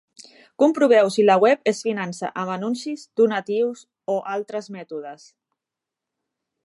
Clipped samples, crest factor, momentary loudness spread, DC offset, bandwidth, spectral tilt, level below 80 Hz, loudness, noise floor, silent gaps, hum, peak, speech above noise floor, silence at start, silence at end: under 0.1%; 18 dB; 18 LU; under 0.1%; 11.5 kHz; -5 dB/octave; -80 dBFS; -21 LUFS; -86 dBFS; none; none; -4 dBFS; 66 dB; 0.6 s; 1.5 s